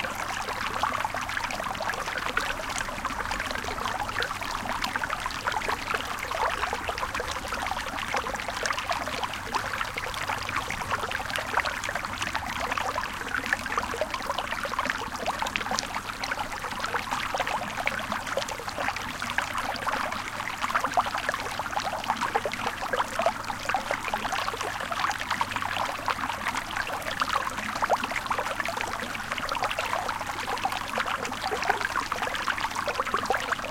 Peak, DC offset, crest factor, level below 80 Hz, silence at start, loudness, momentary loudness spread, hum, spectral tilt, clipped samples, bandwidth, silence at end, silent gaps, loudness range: -4 dBFS; under 0.1%; 26 dB; -48 dBFS; 0 s; -29 LUFS; 4 LU; none; -2.5 dB/octave; under 0.1%; 17 kHz; 0 s; none; 1 LU